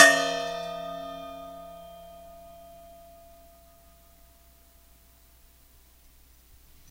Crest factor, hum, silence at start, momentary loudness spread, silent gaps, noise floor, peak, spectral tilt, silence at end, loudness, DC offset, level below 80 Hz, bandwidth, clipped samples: 30 dB; none; 0 s; 23 LU; none; -57 dBFS; 0 dBFS; -1 dB/octave; 4.45 s; -27 LUFS; under 0.1%; -58 dBFS; 16 kHz; under 0.1%